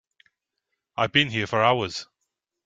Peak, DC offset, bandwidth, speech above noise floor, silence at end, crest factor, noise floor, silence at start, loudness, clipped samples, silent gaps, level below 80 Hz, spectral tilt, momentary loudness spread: -4 dBFS; under 0.1%; 9.2 kHz; 58 dB; 0.6 s; 24 dB; -81 dBFS; 0.95 s; -23 LUFS; under 0.1%; none; -62 dBFS; -4.5 dB/octave; 13 LU